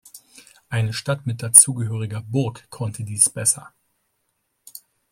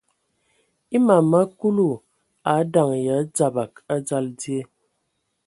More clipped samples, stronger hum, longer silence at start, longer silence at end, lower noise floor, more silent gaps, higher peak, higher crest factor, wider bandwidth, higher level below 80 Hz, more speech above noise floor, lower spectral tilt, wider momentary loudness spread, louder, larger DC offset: neither; neither; second, 0.15 s vs 0.9 s; second, 0.35 s vs 0.8 s; about the same, -72 dBFS vs -74 dBFS; neither; about the same, 0 dBFS vs -2 dBFS; about the same, 22 dB vs 20 dB; first, 16.5 kHz vs 11.5 kHz; first, -60 dBFS vs -66 dBFS; about the same, 52 dB vs 54 dB; second, -3 dB/octave vs -6.5 dB/octave; first, 18 LU vs 12 LU; first, -18 LUFS vs -21 LUFS; neither